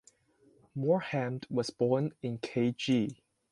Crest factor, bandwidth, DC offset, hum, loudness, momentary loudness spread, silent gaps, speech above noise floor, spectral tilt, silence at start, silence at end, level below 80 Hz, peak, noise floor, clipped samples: 18 dB; 11.5 kHz; under 0.1%; none; -32 LUFS; 7 LU; none; 35 dB; -6.5 dB/octave; 0.75 s; 0.35 s; -72 dBFS; -16 dBFS; -66 dBFS; under 0.1%